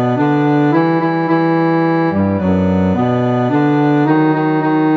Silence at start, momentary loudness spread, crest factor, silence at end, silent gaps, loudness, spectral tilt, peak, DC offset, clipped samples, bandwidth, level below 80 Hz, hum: 0 s; 2 LU; 12 dB; 0 s; none; -14 LUFS; -9.5 dB/octave; -2 dBFS; under 0.1%; under 0.1%; 6.2 kHz; -50 dBFS; none